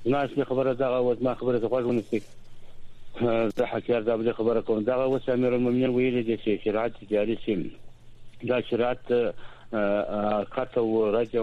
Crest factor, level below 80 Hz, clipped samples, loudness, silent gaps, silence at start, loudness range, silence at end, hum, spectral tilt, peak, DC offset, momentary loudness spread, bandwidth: 14 dB; -50 dBFS; under 0.1%; -26 LUFS; none; 0 s; 3 LU; 0 s; none; -8 dB/octave; -12 dBFS; under 0.1%; 5 LU; 8.2 kHz